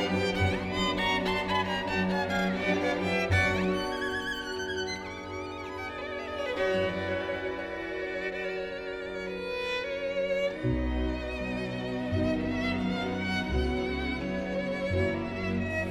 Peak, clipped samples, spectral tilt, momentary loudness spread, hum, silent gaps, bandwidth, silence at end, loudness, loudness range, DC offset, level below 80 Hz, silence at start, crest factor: -14 dBFS; under 0.1%; -5.5 dB/octave; 8 LU; none; none; 15 kHz; 0 s; -30 LUFS; 5 LU; under 0.1%; -44 dBFS; 0 s; 16 dB